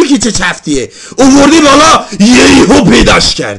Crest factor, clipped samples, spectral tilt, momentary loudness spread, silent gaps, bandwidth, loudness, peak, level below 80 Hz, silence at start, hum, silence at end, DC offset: 6 dB; 4%; -3.5 dB/octave; 11 LU; none; 11.5 kHz; -5 LUFS; 0 dBFS; -24 dBFS; 0 s; none; 0 s; under 0.1%